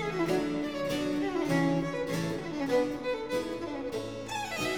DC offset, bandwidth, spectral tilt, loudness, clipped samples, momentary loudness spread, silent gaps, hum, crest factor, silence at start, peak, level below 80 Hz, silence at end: 0.2%; over 20 kHz; -5.5 dB/octave; -31 LUFS; under 0.1%; 7 LU; none; none; 14 dB; 0 s; -16 dBFS; -58 dBFS; 0 s